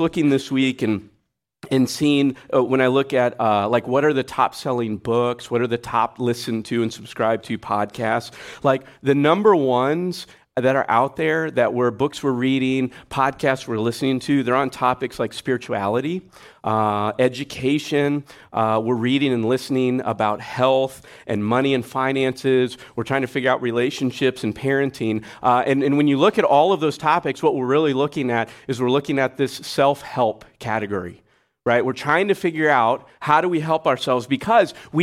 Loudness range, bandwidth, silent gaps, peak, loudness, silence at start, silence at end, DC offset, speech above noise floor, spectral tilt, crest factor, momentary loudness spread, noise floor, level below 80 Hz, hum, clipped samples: 4 LU; 15 kHz; none; -4 dBFS; -20 LUFS; 0 s; 0 s; under 0.1%; 48 dB; -6 dB/octave; 16 dB; 7 LU; -68 dBFS; -58 dBFS; none; under 0.1%